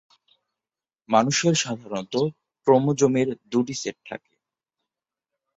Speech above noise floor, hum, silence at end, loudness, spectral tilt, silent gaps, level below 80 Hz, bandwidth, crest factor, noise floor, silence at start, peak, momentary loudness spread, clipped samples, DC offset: over 68 dB; none; 1.4 s; -23 LUFS; -4.5 dB/octave; none; -66 dBFS; 8 kHz; 20 dB; under -90 dBFS; 1.1 s; -4 dBFS; 13 LU; under 0.1%; under 0.1%